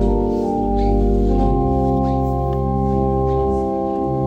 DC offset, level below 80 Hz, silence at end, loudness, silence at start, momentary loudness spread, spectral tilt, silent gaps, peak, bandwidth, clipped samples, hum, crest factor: under 0.1%; -22 dBFS; 0 s; -19 LUFS; 0 s; 3 LU; -10.5 dB/octave; none; -6 dBFS; 7.2 kHz; under 0.1%; none; 12 dB